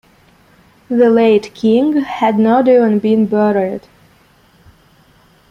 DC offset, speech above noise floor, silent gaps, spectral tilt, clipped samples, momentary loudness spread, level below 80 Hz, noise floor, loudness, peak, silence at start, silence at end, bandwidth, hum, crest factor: under 0.1%; 38 dB; none; -7.5 dB/octave; under 0.1%; 7 LU; -56 dBFS; -50 dBFS; -13 LUFS; -2 dBFS; 0.9 s; 1.7 s; 7.2 kHz; none; 14 dB